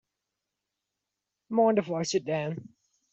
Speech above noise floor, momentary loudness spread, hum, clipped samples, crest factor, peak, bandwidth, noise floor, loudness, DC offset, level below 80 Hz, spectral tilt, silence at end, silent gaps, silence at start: 59 dB; 11 LU; 50 Hz at -55 dBFS; under 0.1%; 18 dB; -14 dBFS; 8 kHz; -86 dBFS; -28 LUFS; under 0.1%; -74 dBFS; -5.5 dB/octave; 0.5 s; none; 1.5 s